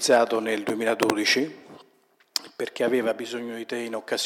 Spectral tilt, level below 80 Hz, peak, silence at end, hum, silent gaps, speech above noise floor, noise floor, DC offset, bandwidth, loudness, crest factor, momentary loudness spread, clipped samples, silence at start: -2.5 dB/octave; -78 dBFS; -2 dBFS; 0 s; none; none; 38 dB; -63 dBFS; under 0.1%; 19 kHz; -25 LUFS; 24 dB; 12 LU; under 0.1%; 0 s